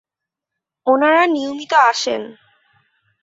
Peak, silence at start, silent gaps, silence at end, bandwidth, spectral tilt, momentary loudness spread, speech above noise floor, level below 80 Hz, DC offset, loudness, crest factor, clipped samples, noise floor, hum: -2 dBFS; 0.85 s; none; 0.9 s; 8 kHz; -2 dB/octave; 12 LU; 69 dB; -70 dBFS; under 0.1%; -16 LUFS; 18 dB; under 0.1%; -84 dBFS; none